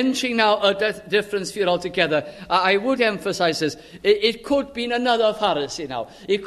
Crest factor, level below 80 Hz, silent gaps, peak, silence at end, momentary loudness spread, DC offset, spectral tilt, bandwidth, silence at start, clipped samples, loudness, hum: 18 dB; -56 dBFS; none; -4 dBFS; 0 s; 7 LU; under 0.1%; -4 dB/octave; 13.5 kHz; 0 s; under 0.1%; -21 LUFS; none